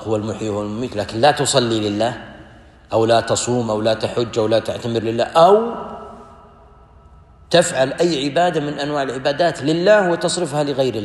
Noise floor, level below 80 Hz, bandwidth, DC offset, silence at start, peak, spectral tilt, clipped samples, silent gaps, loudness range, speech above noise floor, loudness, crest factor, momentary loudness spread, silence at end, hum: -46 dBFS; -50 dBFS; 12.5 kHz; under 0.1%; 0 s; -2 dBFS; -4.5 dB/octave; under 0.1%; none; 3 LU; 28 dB; -18 LUFS; 18 dB; 10 LU; 0 s; none